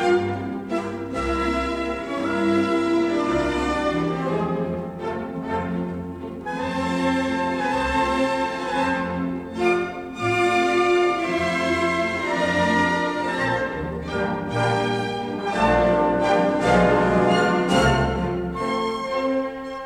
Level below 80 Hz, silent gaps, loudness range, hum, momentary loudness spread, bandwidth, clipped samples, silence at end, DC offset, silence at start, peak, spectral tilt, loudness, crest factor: -40 dBFS; none; 6 LU; none; 9 LU; 12.5 kHz; under 0.1%; 0 s; under 0.1%; 0 s; -6 dBFS; -6 dB/octave; -22 LUFS; 16 dB